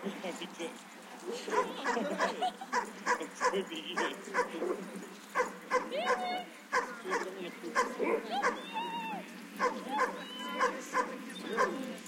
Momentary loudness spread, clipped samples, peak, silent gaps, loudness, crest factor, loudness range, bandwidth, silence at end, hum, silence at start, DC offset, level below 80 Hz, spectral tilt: 9 LU; under 0.1%; -16 dBFS; none; -35 LUFS; 20 dB; 1 LU; 16.5 kHz; 0 s; none; 0 s; under 0.1%; -78 dBFS; -3 dB/octave